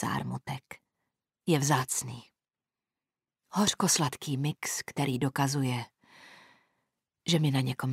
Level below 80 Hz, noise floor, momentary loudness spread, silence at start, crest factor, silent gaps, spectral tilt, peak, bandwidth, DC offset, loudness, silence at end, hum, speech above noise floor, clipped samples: -68 dBFS; under -90 dBFS; 15 LU; 0 s; 20 dB; none; -4 dB/octave; -12 dBFS; 16 kHz; under 0.1%; -30 LUFS; 0 s; none; over 60 dB; under 0.1%